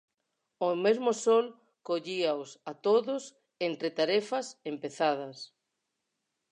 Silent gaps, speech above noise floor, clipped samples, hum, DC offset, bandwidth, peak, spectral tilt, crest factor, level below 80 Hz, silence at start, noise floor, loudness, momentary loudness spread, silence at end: none; 54 dB; under 0.1%; none; under 0.1%; 9.8 kHz; -14 dBFS; -4 dB/octave; 18 dB; -88 dBFS; 0.6 s; -83 dBFS; -30 LUFS; 16 LU; 1.05 s